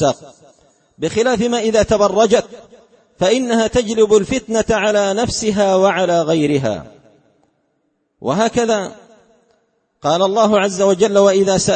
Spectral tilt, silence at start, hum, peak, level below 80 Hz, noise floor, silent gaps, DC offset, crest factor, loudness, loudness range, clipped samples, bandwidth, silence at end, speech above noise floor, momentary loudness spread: -4.5 dB/octave; 0 s; none; 0 dBFS; -44 dBFS; -66 dBFS; none; under 0.1%; 16 dB; -15 LUFS; 6 LU; under 0.1%; 8.8 kHz; 0 s; 52 dB; 9 LU